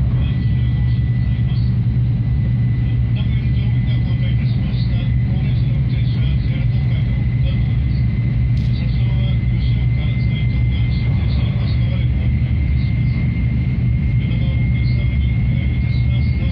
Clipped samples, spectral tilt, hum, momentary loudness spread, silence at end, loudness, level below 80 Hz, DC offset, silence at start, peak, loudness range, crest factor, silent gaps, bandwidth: under 0.1%; -10 dB/octave; none; 1 LU; 0 s; -18 LUFS; -22 dBFS; under 0.1%; 0 s; -6 dBFS; 0 LU; 10 dB; none; 5.2 kHz